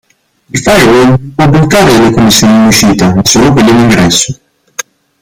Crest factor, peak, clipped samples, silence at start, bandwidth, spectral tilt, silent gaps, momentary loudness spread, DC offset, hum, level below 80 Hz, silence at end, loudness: 6 dB; 0 dBFS; 0.6%; 0.55 s; over 20 kHz; -4.5 dB/octave; none; 15 LU; under 0.1%; none; -30 dBFS; 0.4 s; -5 LUFS